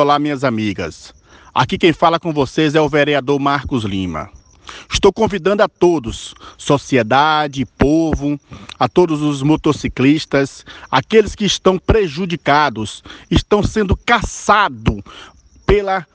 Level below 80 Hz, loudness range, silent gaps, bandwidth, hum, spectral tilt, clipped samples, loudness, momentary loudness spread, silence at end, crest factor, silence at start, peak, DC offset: -32 dBFS; 1 LU; none; 9.8 kHz; none; -5.5 dB/octave; under 0.1%; -15 LUFS; 13 LU; 0.1 s; 16 dB; 0 s; 0 dBFS; under 0.1%